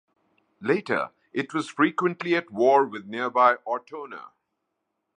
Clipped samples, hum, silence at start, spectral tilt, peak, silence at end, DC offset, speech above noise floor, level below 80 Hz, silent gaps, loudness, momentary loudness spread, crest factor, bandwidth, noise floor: under 0.1%; none; 0.6 s; -6 dB/octave; -6 dBFS; 0.9 s; under 0.1%; 55 dB; -78 dBFS; none; -24 LUFS; 14 LU; 20 dB; 9.8 kHz; -80 dBFS